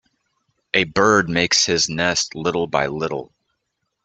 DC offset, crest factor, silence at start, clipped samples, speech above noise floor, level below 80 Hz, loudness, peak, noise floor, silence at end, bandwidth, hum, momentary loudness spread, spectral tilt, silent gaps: under 0.1%; 20 dB; 0.75 s; under 0.1%; 56 dB; -52 dBFS; -18 LUFS; -2 dBFS; -75 dBFS; 0.8 s; 9 kHz; none; 8 LU; -3 dB/octave; none